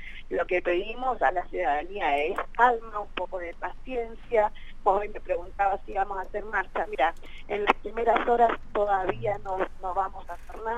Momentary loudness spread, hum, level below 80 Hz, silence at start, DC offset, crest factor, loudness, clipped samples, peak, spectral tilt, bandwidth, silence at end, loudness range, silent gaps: 11 LU; none; -42 dBFS; 0 s; under 0.1%; 24 dB; -28 LUFS; under 0.1%; -4 dBFS; -5.5 dB/octave; 9.4 kHz; 0 s; 3 LU; none